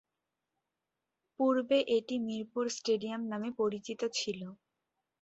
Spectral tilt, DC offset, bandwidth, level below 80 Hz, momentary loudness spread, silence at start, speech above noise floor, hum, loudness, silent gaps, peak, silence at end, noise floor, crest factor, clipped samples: -4 dB/octave; under 0.1%; 8.2 kHz; -78 dBFS; 8 LU; 1.4 s; 55 dB; none; -33 LUFS; none; -18 dBFS; 0.7 s; -88 dBFS; 18 dB; under 0.1%